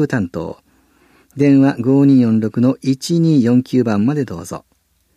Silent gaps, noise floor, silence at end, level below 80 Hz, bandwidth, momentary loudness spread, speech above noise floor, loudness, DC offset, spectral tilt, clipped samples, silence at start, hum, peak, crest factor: none; -54 dBFS; 0.55 s; -54 dBFS; 12.5 kHz; 17 LU; 40 dB; -15 LUFS; under 0.1%; -7.5 dB/octave; under 0.1%; 0 s; none; -2 dBFS; 14 dB